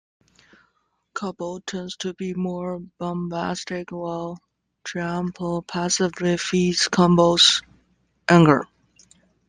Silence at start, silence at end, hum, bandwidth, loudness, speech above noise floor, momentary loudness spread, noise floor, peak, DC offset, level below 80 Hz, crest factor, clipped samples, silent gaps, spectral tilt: 1.15 s; 0.85 s; none; 9.8 kHz; -22 LUFS; 48 dB; 17 LU; -70 dBFS; -2 dBFS; under 0.1%; -56 dBFS; 22 dB; under 0.1%; none; -4.5 dB/octave